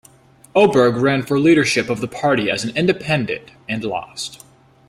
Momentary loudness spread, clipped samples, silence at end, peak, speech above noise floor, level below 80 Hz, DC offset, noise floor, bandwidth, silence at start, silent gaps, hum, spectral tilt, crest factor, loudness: 13 LU; under 0.1%; 0.55 s; -2 dBFS; 31 dB; -54 dBFS; under 0.1%; -49 dBFS; 15.5 kHz; 0.55 s; none; none; -5 dB/octave; 16 dB; -18 LUFS